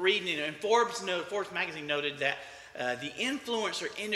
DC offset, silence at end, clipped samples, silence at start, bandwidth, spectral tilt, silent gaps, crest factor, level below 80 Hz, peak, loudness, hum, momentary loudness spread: under 0.1%; 0 s; under 0.1%; 0 s; 15 kHz; -2.5 dB/octave; none; 20 dB; -74 dBFS; -12 dBFS; -31 LUFS; none; 8 LU